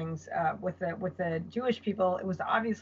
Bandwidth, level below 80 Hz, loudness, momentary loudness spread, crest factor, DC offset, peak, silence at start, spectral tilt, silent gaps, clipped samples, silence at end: 7.6 kHz; -72 dBFS; -32 LUFS; 5 LU; 16 dB; under 0.1%; -16 dBFS; 0 s; -5 dB/octave; none; under 0.1%; 0 s